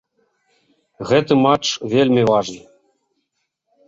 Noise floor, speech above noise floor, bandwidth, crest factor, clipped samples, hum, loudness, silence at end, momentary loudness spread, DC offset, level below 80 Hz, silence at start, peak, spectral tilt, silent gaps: -73 dBFS; 57 dB; 7.8 kHz; 18 dB; under 0.1%; none; -16 LUFS; 1.3 s; 16 LU; under 0.1%; -56 dBFS; 1 s; -2 dBFS; -5.5 dB/octave; none